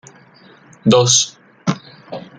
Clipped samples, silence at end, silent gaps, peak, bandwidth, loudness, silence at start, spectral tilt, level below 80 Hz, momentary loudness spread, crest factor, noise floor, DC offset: under 0.1%; 0.2 s; none; 0 dBFS; 10.5 kHz; -15 LUFS; 0.85 s; -3.5 dB/octave; -58 dBFS; 21 LU; 18 dB; -46 dBFS; under 0.1%